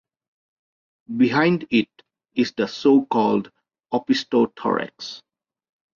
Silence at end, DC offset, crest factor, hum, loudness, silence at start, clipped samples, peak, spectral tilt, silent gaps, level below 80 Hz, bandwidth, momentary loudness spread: 0.8 s; under 0.1%; 18 dB; none; -21 LUFS; 1.1 s; under 0.1%; -6 dBFS; -6 dB/octave; none; -66 dBFS; 7.2 kHz; 16 LU